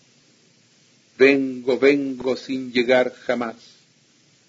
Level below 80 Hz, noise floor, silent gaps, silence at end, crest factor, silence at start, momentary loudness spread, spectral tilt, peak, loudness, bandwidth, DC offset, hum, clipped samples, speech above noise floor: -66 dBFS; -58 dBFS; none; 0.95 s; 20 dB; 1.2 s; 10 LU; -5 dB/octave; -2 dBFS; -20 LUFS; 7.8 kHz; under 0.1%; none; under 0.1%; 38 dB